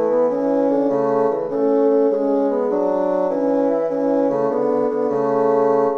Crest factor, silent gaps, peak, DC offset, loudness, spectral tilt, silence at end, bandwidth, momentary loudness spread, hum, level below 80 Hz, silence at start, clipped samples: 12 dB; none; -6 dBFS; under 0.1%; -18 LUFS; -9 dB/octave; 0 s; 6.4 kHz; 3 LU; none; -62 dBFS; 0 s; under 0.1%